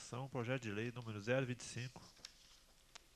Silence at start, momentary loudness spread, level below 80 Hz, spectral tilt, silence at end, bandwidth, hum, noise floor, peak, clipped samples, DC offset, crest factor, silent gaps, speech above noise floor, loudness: 0 s; 21 LU; -72 dBFS; -5.5 dB/octave; 0.45 s; 13 kHz; none; -67 dBFS; -24 dBFS; under 0.1%; under 0.1%; 22 dB; none; 23 dB; -44 LUFS